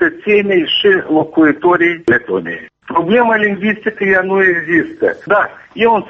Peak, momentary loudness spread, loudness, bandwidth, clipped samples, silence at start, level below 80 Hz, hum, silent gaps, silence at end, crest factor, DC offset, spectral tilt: -2 dBFS; 7 LU; -13 LUFS; 6.6 kHz; under 0.1%; 0 s; -52 dBFS; none; none; 0 s; 12 dB; under 0.1%; -7 dB/octave